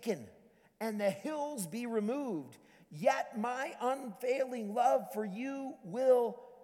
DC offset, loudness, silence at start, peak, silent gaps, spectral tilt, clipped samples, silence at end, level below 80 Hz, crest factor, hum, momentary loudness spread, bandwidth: under 0.1%; -35 LUFS; 0 s; -16 dBFS; none; -5 dB/octave; under 0.1%; 0 s; -84 dBFS; 18 dB; none; 11 LU; 18.5 kHz